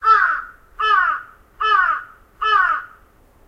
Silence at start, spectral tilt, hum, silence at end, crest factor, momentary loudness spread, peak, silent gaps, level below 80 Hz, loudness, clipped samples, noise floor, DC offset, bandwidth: 0 s; -1 dB/octave; none; 0.6 s; 16 dB; 11 LU; -4 dBFS; none; -52 dBFS; -18 LUFS; under 0.1%; -51 dBFS; under 0.1%; 7.8 kHz